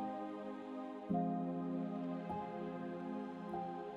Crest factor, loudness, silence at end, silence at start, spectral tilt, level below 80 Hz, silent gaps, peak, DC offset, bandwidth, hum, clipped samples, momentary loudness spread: 16 dB; -43 LUFS; 0 s; 0 s; -9 dB/octave; -74 dBFS; none; -26 dBFS; under 0.1%; 7.2 kHz; none; under 0.1%; 8 LU